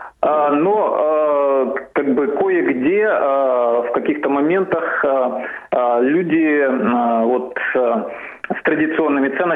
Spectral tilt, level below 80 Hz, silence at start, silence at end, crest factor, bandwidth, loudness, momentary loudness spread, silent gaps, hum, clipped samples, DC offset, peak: -9 dB/octave; -60 dBFS; 0 s; 0 s; 14 dB; 3.9 kHz; -17 LUFS; 5 LU; none; none; under 0.1%; under 0.1%; -2 dBFS